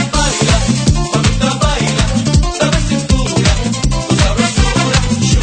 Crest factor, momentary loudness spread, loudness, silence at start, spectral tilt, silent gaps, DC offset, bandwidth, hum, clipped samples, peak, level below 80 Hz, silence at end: 12 dB; 2 LU; -13 LUFS; 0 s; -4.5 dB/octave; none; under 0.1%; 9.4 kHz; none; under 0.1%; 0 dBFS; -18 dBFS; 0 s